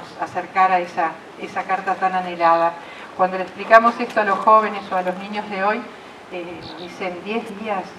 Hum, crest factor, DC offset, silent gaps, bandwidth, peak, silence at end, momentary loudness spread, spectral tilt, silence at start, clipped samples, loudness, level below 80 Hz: none; 20 dB; under 0.1%; none; 12 kHz; 0 dBFS; 0 s; 19 LU; -5.5 dB/octave; 0 s; under 0.1%; -20 LUFS; -64 dBFS